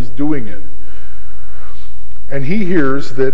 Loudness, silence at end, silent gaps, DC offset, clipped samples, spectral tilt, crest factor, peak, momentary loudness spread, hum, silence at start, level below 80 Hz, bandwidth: -19 LUFS; 0 s; none; 60%; 0.4%; -8 dB/octave; 18 dB; 0 dBFS; 24 LU; none; 0 s; -38 dBFS; 7.8 kHz